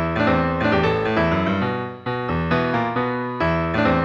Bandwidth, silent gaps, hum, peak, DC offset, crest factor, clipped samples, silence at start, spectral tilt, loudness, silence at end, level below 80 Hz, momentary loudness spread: 7.2 kHz; none; none; -6 dBFS; under 0.1%; 14 dB; under 0.1%; 0 s; -8 dB/octave; -21 LUFS; 0 s; -40 dBFS; 5 LU